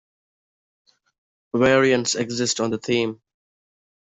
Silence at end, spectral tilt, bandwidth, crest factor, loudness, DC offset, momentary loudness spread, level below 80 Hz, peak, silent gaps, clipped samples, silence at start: 0.95 s; -3.5 dB/octave; 8.2 kHz; 20 dB; -21 LUFS; under 0.1%; 8 LU; -58 dBFS; -4 dBFS; none; under 0.1%; 1.55 s